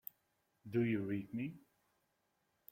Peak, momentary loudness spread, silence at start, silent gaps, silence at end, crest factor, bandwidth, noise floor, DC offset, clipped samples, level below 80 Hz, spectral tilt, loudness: -26 dBFS; 16 LU; 0.65 s; none; 1.15 s; 18 dB; 16 kHz; -82 dBFS; under 0.1%; under 0.1%; -78 dBFS; -9 dB/octave; -40 LUFS